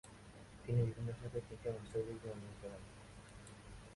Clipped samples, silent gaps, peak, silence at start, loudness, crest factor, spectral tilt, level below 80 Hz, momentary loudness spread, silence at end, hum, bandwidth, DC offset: under 0.1%; none; -26 dBFS; 0.05 s; -44 LUFS; 18 dB; -7.5 dB/octave; -60 dBFS; 19 LU; 0 s; none; 11.5 kHz; under 0.1%